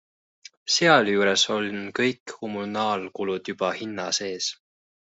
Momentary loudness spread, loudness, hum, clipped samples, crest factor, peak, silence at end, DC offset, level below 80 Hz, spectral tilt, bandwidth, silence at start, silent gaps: 13 LU; -24 LUFS; none; under 0.1%; 22 dB; -4 dBFS; 0.6 s; under 0.1%; -70 dBFS; -3 dB/octave; 8.2 kHz; 0.65 s; 2.20-2.26 s